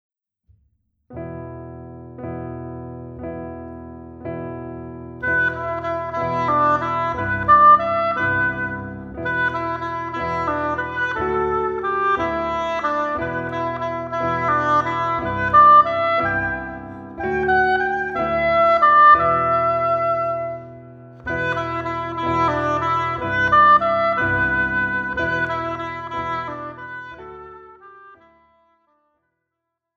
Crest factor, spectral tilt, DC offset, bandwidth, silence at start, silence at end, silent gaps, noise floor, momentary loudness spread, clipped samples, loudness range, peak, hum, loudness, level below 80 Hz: 18 dB; -6.5 dB/octave; under 0.1%; 7.4 kHz; 1.1 s; 1.8 s; none; -80 dBFS; 21 LU; under 0.1%; 16 LU; -2 dBFS; none; -19 LUFS; -46 dBFS